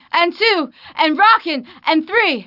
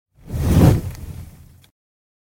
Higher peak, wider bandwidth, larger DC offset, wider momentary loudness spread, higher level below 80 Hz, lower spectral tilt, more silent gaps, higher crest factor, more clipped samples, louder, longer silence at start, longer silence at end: about the same, -2 dBFS vs -2 dBFS; second, 5.8 kHz vs 17 kHz; neither; second, 9 LU vs 22 LU; second, -70 dBFS vs -28 dBFS; second, -4 dB/octave vs -7.5 dB/octave; neither; about the same, 14 dB vs 18 dB; neither; about the same, -15 LUFS vs -17 LUFS; about the same, 0.15 s vs 0.25 s; second, 0.05 s vs 1.05 s